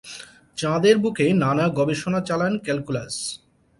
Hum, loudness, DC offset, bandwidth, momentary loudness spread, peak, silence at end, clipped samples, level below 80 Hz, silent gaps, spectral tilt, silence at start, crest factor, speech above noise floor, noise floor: none; -22 LUFS; under 0.1%; 11.5 kHz; 16 LU; -4 dBFS; 0.45 s; under 0.1%; -56 dBFS; none; -5.5 dB/octave; 0.05 s; 18 dB; 21 dB; -42 dBFS